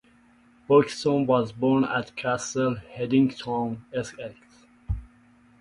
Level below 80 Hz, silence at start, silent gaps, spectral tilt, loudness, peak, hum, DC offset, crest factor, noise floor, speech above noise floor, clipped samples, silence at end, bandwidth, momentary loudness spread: -46 dBFS; 0.7 s; none; -6 dB/octave; -25 LUFS; -6 dBFS; none; under 0.1%; 20 dB; -58 dBFS; 34 dB; under 0.1%; 0.55 s; 11 kHz; 14 LU